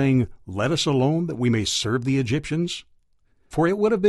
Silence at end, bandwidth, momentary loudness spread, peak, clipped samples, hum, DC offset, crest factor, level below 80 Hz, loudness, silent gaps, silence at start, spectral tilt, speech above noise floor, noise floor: 0 s; 12.5 kHz; 8 LU; -6 dBFS; under 0.1%; none; under 0.1%; 16 dB; -50 dBFS; -23 LUFS; none; 0 s; -5.5 dB/octave; 40 dB; -62 dBFS